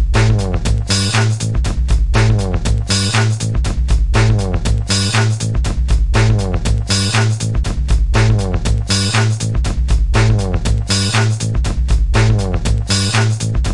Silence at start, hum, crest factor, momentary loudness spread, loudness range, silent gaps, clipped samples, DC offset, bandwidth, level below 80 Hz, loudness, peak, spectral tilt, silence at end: 0 s; none; 14 dB; 5 LU; 0 LU; none; under 0.1%; under 0.1%; 11.5 kHz; -18 dBFS; -15 LUFS; 0 dBFS; -4.5 dB/octave; 0 s